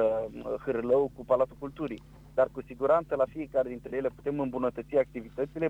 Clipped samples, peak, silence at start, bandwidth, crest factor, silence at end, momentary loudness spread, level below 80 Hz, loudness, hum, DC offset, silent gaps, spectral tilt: under 0.1%; -14 dBFS; 0 s; 8 kHz; 16 dB; 0 s; 9 LU; -56 dBFS; -30 LUFS; none; under 0.1%; none; -8.5 dB/octave